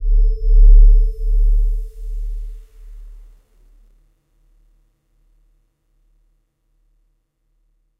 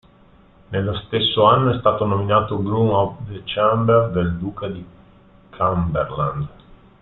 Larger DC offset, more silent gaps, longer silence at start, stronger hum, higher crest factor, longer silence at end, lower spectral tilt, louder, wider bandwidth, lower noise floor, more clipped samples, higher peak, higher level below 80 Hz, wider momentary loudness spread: neither; neither; second, 0 s vs 0.7 s; neither; about the same, 16 dB vs 20 dB; first, 4.95 s vs 0.25 s; second, -9 dB/octave vs -11 dB/octave; about the same, -18 LUFS vs -19 LUFS; second, 0.5 kHz vs 4.2 kHz; first, -65 dBFS vs -50 dBFS; neither; about the same, 0 dBFS vs 0 dBFS; first, -16 dBFS vs -44 dBFS; first, 29 LU vs 14 LU